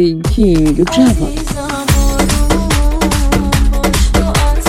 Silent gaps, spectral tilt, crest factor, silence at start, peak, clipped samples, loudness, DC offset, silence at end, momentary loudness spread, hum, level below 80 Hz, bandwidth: none; -5 dB/octave; 12 dB; 0 s; 0 dBFS; under 0.1%; -13 LUFS; under 0.1%; 0 s; 6 LU; none; -14 dBFS; 17 kHz